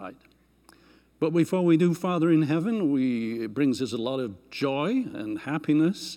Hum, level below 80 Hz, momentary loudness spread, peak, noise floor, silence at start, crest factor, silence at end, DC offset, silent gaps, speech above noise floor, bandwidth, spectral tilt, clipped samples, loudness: none; -68 dBFS; 9 LU; -10 dBFS; -61 dBFS; 0 s; 16 dB; 0 s; under 0.1%; none; 36 dB; 14 kHz; -7 dB/octave; under 0.1%; -26 LUFS